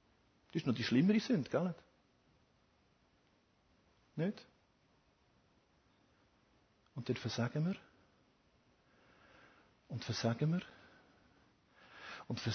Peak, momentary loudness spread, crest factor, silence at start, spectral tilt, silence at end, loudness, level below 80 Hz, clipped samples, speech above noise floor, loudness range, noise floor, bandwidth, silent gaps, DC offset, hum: -20 dBFS; 19 LU; 22 dB; 0.55 s; -6 dB/octave; 0 s; -38 LUFS; -74 dBFS; under 0.1%; 38 dB; 12 LU; -74 dBFS; 6.4 kHz; none; under 0.1%; none